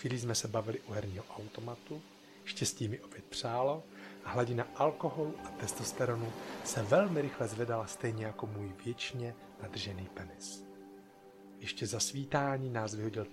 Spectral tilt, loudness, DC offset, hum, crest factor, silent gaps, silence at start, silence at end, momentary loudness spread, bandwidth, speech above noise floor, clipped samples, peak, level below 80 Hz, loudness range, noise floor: -4.5 dB/octave; -37 LUFS; under 0.1%; none; 22 dB; none; 0 s; 0 s; 14 LU; 15.5 kHz; 20 dB; under 0.1%; -16 dBFS; -68 dBFS; 7 LU; -56 dBFS